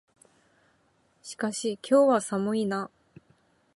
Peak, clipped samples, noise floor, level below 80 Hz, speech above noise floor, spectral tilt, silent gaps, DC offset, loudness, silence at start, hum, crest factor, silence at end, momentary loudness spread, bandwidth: -10 dBFS; under 0.1%; -67 dBFS; -76 dBFS; 42 dB; -5 dB/octave; none; under 0.1%; -26 LUFS; 1.25 s; none; 18 dB; 0.9 s; 20 LU; 11.5 kHz